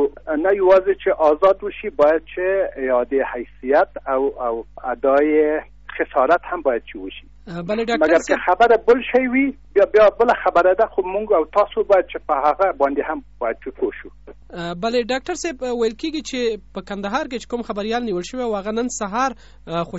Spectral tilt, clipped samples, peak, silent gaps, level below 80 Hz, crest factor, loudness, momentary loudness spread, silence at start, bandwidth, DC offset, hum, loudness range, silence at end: -3 dB/octave; under 0.1%; -4 dBFS; none; -46 dBFS; 14 dB; -19 LUFS; 12 LU; 0 s; 8 kHz; 0.4%; 50 Hz at -50 dBFS; 8 LU; 0 s